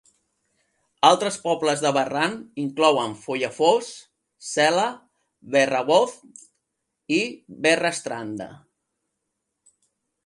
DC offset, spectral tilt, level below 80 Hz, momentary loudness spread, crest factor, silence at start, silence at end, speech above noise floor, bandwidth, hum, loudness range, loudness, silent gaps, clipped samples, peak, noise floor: under 0.1%; -3.5 dB/octave; -72 dBFS; 12 LU; 22 dB; 1 s; 1.7 s; 57 dB; 11.5 kHz; none; 5 LU; -22 LUFS; none; under 0.1%; -2 dBFS; -79 dBFS